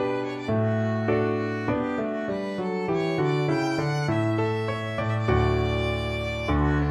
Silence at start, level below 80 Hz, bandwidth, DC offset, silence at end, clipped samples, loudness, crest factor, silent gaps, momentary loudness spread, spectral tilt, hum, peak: 0 s; -38 dBFS; 11 kHz; under 0.1%; 0 s; under 0.1%; -26 LUFS; 14 dB; none; 5 LU; -7.5 dB/octave; none; -10 dBFS